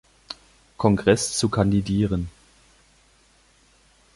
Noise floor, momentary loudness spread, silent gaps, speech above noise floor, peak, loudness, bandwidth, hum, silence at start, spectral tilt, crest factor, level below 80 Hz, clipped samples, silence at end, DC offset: -58 dBFS; 20 LU; none; 38 dB; -4 dBFS; -22 LUFS; 11.5 kHz; none; 0.3 s; -5.5 dB/octave; 22 dB; -44 dBFS; under 0.1%; 1.85 s; under 0.1%